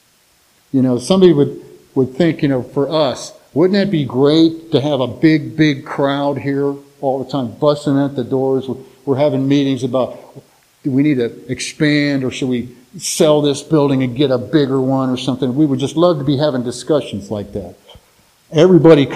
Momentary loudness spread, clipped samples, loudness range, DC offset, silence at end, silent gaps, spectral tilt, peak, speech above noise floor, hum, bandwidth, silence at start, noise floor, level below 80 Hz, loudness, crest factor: 11 LU; under 0.1%; 3 LU; under 0.1%; 0 s; none; -6 dB/octave; 0 dBFS; 40 dB; none; 14.5 kHz; 0.75 s; -54 dBFS; -52 dBFS; -15 LUFS; 16 dB